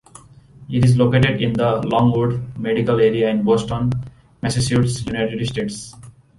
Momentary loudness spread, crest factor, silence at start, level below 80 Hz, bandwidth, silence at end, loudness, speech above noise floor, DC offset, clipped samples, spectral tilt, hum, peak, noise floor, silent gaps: 11 LU; 14 dB; 0.6 s; -42 dBFS; 11.5 kHz; 0.3 s; -19 LUFS; 27 dB; under 0.1%; under 0.1%; -6.5 dB/octave; none; -4 dBFS; -45 dBFS; none